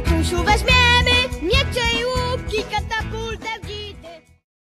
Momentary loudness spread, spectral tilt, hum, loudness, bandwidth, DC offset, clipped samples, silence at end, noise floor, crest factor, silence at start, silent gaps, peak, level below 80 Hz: 15 LU; -4 dB/octave; none; -18 LUFS; 14 kHz; under 0.1%; under 0.1%; 0.55 s; -41 dBFS; 18 dB; 0 s; none; -2 dBFS; -28 dBFS